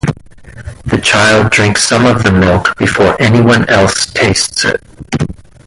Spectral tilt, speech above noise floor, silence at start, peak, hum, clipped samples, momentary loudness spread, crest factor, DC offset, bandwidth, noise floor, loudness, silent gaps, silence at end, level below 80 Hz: -4.5 dB/octave; 23 dB; 0.05 s; 0 dBFS; none; under 0.1%; 13 LU; 10 dB; under 0.1%; 11.5 kHz; -32 dBFS; -9 LUFS; none; 0.35 s; -30 dBFS